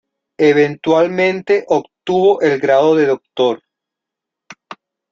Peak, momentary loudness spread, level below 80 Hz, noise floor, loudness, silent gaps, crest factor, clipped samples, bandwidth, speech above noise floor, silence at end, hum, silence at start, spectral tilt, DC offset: -2 dBFS; 6 LU; -60 dBFS; -83 dBFS; -14 LUFS; none; 14 dB; under 0.1%; 7.4 kHz; 69 dB; 0.4 s; none; 0.4 s; -6 dB/octave; under 0.1%